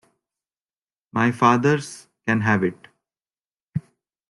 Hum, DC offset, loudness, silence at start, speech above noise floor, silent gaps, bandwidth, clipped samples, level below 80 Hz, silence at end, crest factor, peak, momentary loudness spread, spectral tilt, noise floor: none; under 0.1%; -22 LUFS; 1.15 s; over 70 dB; 3.46-3.50 s, 3.62-3.72 s; 12 kHz; under 0.1%; -64 dBFS; 0.5 s; 20 dB; -4 dBFS; 15 LU; -6.5 dB/octave; under -90 dBFS